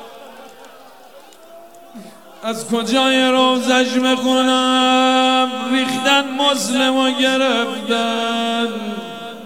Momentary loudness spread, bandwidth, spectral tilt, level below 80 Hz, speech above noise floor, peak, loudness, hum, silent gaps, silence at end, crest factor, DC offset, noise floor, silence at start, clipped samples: 12 LU; 16.5 kHz; -2.5 dB/octave; -72 dBFS; 26 dB; -2 dBFS; -16 LUFS; none; none; 0 s; 16 dB; 0.4%; -43 dBFS; 0 s; under 0.1%